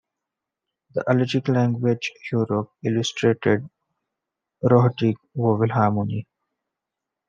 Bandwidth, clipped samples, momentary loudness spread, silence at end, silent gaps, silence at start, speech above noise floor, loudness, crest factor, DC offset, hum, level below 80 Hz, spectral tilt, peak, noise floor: 7.4 kHz; under 0.1%; 8 LU; 1.05 s; none; 0.95 s; 64 dB; -22 LUFS; 20 dB; under 0.1%; none; -68 dBFS; -7 dB/octave; -4 dBFS; -85 dBFS